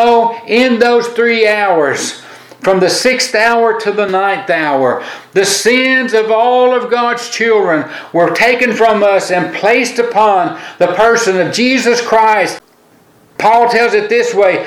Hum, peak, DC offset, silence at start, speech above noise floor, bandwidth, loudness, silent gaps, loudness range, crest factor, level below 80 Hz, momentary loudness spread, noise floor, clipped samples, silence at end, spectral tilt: none; 0 dBFS; under 0.1%; 0 s; 36 dB; 15 kHz; -11 LUFS; none; 1 LU; 12 dB; -54 dBFS; 6 LU; -47 dBFS; under 0.1%; 0 s; -3 dB/octave